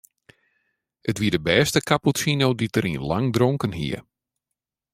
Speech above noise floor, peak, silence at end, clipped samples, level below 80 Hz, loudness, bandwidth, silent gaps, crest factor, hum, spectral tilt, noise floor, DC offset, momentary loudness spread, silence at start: 63 dB; -4 dBFS; 0.95 s; under 0.1%; -52 dBFS; -22 LUFS; 16 kHz; none; 20 dB; none; -5 dB/octave; -85 dBFS; under 0.1%; 10 LU; 1.05 s